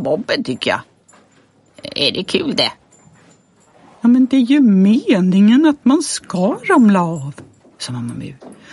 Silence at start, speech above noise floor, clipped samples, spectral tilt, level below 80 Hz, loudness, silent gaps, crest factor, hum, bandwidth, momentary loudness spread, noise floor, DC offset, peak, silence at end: 0 s; 38 dB; under 0.1%; -5.5 dB/octave; -60 dBFS; -14 LUFS; none; 14 dB; none; 11.5 kHz; 16 LU; -53 dBFS; under 0.1%; -2 dBFS; 0.2 s